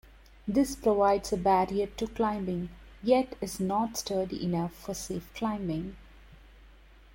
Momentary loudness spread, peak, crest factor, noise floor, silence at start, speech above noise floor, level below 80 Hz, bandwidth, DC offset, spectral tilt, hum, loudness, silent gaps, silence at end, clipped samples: 11 LU; -12 dBFS; 18 dB; -54 dBFS; 0.45 s; 25 dB; -52 dBFS; 16.5 kHz; under 0.1%; -5.5 dB/octave; none; -30 LUFS; none; 0.45 s; under 0.1%